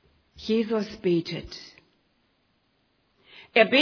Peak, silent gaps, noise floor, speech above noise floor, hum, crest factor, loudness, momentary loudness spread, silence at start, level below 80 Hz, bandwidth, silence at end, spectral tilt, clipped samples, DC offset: -4 dBFS; none; -69 dBFS; 46 dB; none; 24 dB; -26 LUFS; 19 LU; 0.4 s; -60 dBFS; 5.4 kHz; 0 s; -5.5 dB/octave; under 0.1%; under 0.1%